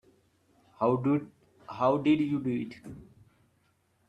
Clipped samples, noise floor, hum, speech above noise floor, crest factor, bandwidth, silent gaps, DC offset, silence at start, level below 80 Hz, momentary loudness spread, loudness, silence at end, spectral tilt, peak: under 0.1%; -71 dBFS; none; 43 dB; 18 dB; 8 kHz; none; under 0.1%; 0.8 s; -68 dBFS; 22 LU; -29 LUFS; 1.05 s; -8.5 dB/octave; -12 dBFS